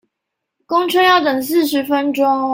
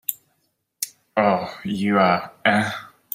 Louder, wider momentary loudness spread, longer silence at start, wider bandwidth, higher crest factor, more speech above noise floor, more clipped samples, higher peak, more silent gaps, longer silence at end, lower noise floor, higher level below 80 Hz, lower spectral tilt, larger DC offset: first, -15 LUFS vs -22 LUFS; second, 6 LU vs 12 LU; first, 0.7 s vs 0.1 s; about the same, 16.5 kHz vs 16 kHz; second, 14 dB vs 22 dB; first, 64 dB vs 50 dB; neither; about the same, -2 dBFS vs -2 dBFS; neither; second, 0 s vs 0.25 s; first, -78 dBFS vs -71 dBFS; about the same, -64 dBFS vs -64 dBFS; second, -3 dB/octave vs -4.5 dB/octave; neither